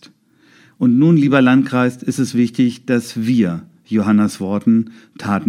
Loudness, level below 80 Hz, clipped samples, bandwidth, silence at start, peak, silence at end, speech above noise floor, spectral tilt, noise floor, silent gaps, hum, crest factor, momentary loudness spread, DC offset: -16 LUFS; -62 dBFS; under 0.1%; 13 kHz; 0.8 s; 0 dBFS; 0 s; 37 dB; -7 dB/octave; -52 dBFS; none; none; 16 dB; 9 LU; under 0.1%